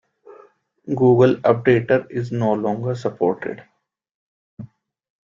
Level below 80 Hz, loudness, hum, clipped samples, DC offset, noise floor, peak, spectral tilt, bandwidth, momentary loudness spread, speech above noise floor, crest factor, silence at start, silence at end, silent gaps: -60 dBFS; -19 LUFS; none; under 0.1%; under 0.1%; -52 dBFS; -2 dBFS; -8.5 dB/octave; 7.4 kHz; 14 LU; 34 dB; 20 dB; 0.3 s; 0.65 s; 4.11-4.57 s